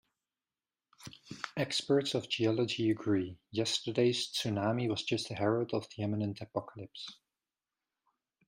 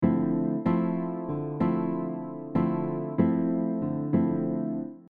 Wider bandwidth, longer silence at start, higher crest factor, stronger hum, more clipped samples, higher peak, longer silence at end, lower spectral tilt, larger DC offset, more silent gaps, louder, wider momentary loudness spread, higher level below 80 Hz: first, 15.5 kHz vs 4.2 kHz; first, 1 s vs 0 s; about the same, 18 dB vs 16 dB; neither; neither; second, -16 dBFS vs -10 dBFS; first, 1.35 s vs 0.1 s; second, -5 dB/octave vs -12 dB/octave; neither; neither; second, -33 LUFS vs -28 LUFS; first, 15 LU vs 7 LU; second, -74 dBFS vs -62 dBFS